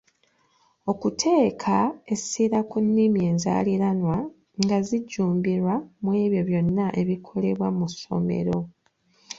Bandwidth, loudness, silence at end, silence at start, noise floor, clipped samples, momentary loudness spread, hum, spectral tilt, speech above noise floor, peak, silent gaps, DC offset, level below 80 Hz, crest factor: 7.8 kHz; -24 LUFS; 0.05 s; 0.85 s; -65 dBFS; under 0.1%; 7 LU; none; -6.5 dB/octave; 42 dB; -4 dBFS; none; under 0.1%; -58 dBFS; 20 dB